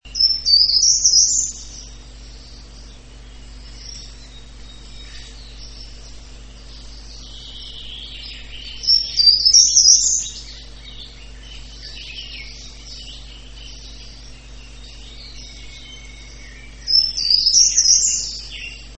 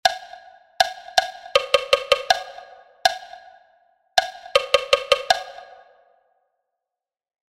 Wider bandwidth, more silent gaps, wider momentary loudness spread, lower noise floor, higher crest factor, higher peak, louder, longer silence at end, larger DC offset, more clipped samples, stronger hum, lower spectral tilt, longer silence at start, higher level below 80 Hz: second, 8.8 kHz vs 16 kHz; neither; first, 27 LU vs 19 LU; second, -39 dBFS vs -87 dBFS; about the same, 20 dB vs 24 dB; about the same, 0 dBFS vs 0 dBFS; first, -12 LUFS vs -21 LUFS; second, 0.05 s vs 1.9 s; first, 0.3% vs under 0.1%; neither; neither; about the same, 1.5 dB/octave vs 0.5 dB/octave; about the same, 0.05 s vs 0.05 s; first, -40 dBFS vs -56 dBFS